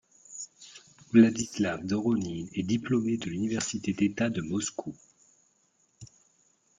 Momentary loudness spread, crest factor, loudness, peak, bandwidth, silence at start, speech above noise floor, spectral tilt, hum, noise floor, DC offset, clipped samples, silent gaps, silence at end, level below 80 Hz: 19 LU; 22 dB; -28 LUFS; -8 dBFS; 9.6 kHz; 0.3 s; 42 dB; -5 dB/octave; none; -70 dBFS; under 0.1%; under 0.1%; none; 0.75 s; -64 dBFS